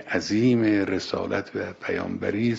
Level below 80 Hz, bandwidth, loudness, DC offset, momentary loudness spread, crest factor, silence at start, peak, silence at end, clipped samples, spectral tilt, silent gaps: -60 dBFS; 8 kHz; -25 LUFS; under 0.1%; 9 LU; 16 dB; 0 s; -8 dBFS; 0 s; under 0.1%; -6 dB/octave; none